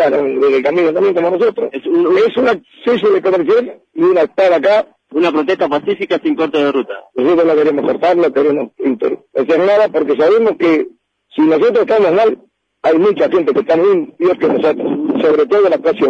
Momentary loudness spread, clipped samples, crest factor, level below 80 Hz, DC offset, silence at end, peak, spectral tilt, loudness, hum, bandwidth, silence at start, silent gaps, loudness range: 6 LU; under 0.1%; 10 dB; -60 dBFS; under 0.1%; 0 s; -4 dBFS; -7 dB/octave; -13 LUFS; none; 7.2 kHz; 0 s; none; 1 LU